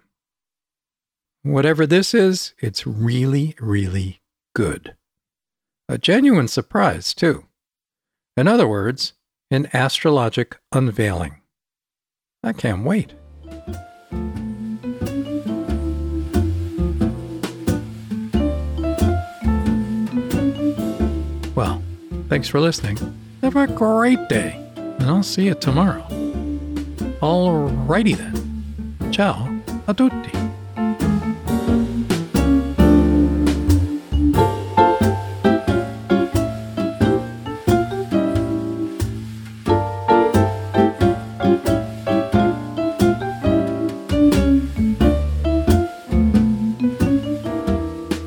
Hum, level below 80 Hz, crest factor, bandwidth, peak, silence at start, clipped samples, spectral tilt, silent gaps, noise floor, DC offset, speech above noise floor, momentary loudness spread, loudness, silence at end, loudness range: none; -30 dBFS; 18 dB; over 20 kHz; -2 dBFS; 1.45 s; under 0.1%; -6.5 dB/octave; none; under -90 dBFS; under 0.1%; over 72 dB; 12 LU; -20 LUFS; 0 s; 6 LU